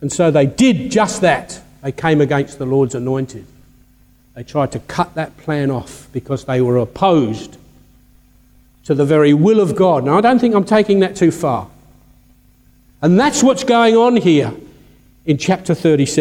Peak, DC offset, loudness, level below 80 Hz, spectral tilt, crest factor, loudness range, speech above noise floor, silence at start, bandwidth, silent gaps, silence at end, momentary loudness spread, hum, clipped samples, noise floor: 0 dBFS; under 0.1%; -15 LUFS; -48 dBFS; -6 dB/octave; 14 dB; 7 LU; 36 dB; 0 s; 15.5 kHz; none; 0 s; 13 LU; 50 Hz at -45 dBFS; under 0.1%; -50 dBFS